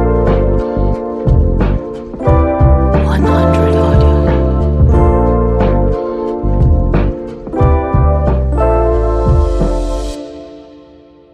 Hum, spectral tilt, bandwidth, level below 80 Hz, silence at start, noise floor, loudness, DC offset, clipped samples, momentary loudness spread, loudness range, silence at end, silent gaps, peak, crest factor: none; -9 dB/octave; 8.6 kHz; -14 dBFS; 0 s; -40 dBFS; -13 LUFS; under 0.1%; under 0.1%; 9 LU; 3 LU; 0.7 s; none; 0 dBFS; 10 dB